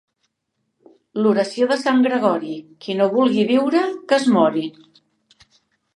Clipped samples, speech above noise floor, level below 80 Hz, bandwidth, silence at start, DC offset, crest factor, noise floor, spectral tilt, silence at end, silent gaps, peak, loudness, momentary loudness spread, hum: under 0.1%; 56 dB; -74 dBFS; 11 kHz; 1.15 s; under 0.1%; 18 dB; -74 dBFS; -5.5 dB/octave; 1.25 s; none; -2 dBFS; -18 LUFS; 12 LU; none